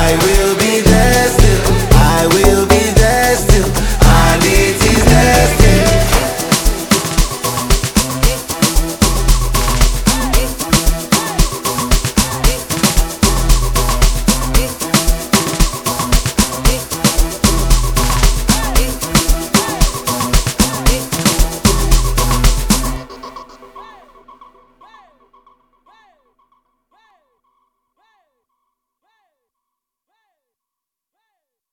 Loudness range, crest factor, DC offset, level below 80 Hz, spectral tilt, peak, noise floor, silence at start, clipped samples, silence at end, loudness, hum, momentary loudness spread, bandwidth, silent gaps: 5 LU; 12 dB; under 0.1%; -16 dBFS; -4 dB/octave; 0 dBFS; -84 dBFS; 0 s; under 0.1%; 7.9 s; -13 LUFS; none; 6 LU; over 20 kHz; none